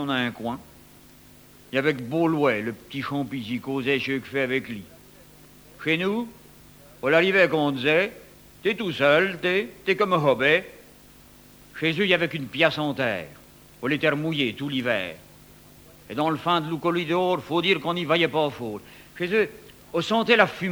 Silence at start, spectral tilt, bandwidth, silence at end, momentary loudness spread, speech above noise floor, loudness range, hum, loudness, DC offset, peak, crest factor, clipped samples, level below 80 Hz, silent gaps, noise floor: 0 s; -5.5 dB/octave; over 20 kHz; 0 s; 13 LU; 27 dB; 5 LU; none; -24 LUFS; under 0.1%; -4 dBFS; 22 dB; under 0.1%; -60 dBFS; none; -51 dBFS